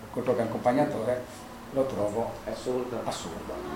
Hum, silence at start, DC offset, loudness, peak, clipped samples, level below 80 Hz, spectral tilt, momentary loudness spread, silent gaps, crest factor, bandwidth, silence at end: none; 0 s; under 0.1%; -30 LUFS; -12 dBFS; under 0.1%; -54 dBFS; -6 dB/octave; 10 LU; none; 18 dB; 17 kHz; 0 s